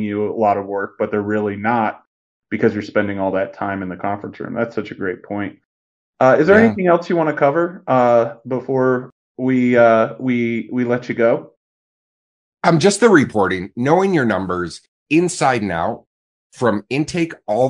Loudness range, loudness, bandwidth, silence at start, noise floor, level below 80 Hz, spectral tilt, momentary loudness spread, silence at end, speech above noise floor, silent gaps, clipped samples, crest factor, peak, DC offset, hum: 6 LU; -17 LUFS; 11 kHz; 0 s; under -90 dBFS; -60 dBFS; -6 dB/octave; 12 LU; 0 s; over 73 dB; 2.07-2.42 s, 5.65-6.13 s, 9.12-9.35 s, 11.57-12.57 s, 14.88-15.06 s, 16.07-16.50 s; under 0.1%; 18 dB; 0 dBFS; under 0.1%; none